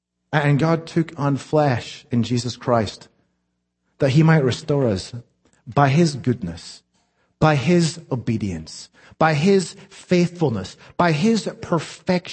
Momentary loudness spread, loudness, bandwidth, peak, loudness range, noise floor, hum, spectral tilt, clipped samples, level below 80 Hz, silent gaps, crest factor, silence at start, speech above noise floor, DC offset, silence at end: 14 LU; -20 LUFS; 8.8 kHz; 0 dBFS; 2 LU; -73 dBFS; none; -6.5 dB/octave; under 0.1%; -52 dBFS; none; 20 dB; 0.3 s; 53 dB; under 0.1%; 0 s